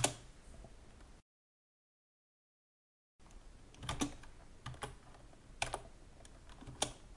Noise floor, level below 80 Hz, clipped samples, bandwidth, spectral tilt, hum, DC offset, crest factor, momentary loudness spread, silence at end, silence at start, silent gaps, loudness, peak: under -90 dBFS; -58 dBFS; under 0.1%; 11.5 kHz; -2.5 dB/octave; none; under 0.1%; 32 dB; 20 LU; 0 s; 0 s; 1.22-3.19 s; -44 LUFS; -16 dBFS